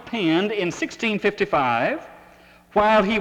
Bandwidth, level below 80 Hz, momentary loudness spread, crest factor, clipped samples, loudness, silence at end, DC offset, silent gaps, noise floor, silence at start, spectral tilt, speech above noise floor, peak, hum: 12 kHz; -52 dBFS; 8 LU; 18 dB; under 0.1%; -21 LUFS; 0 s; under 0.1%; none; -50 dBFS; 0 s; -5 dB/octave; 29 dB; -4 dBFS; none